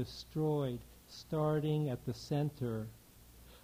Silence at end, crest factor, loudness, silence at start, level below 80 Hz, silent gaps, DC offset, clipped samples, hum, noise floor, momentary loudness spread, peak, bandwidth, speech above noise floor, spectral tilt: 0.05 s; 16 dB; -37 LUFS; 0 s; -62 dBFS; none; under 0.1%; under 0.1%; none; -59 dBFS; 14 LU; -22 dBFS; 16 kHz; 22 dB; -7.5 dB/octave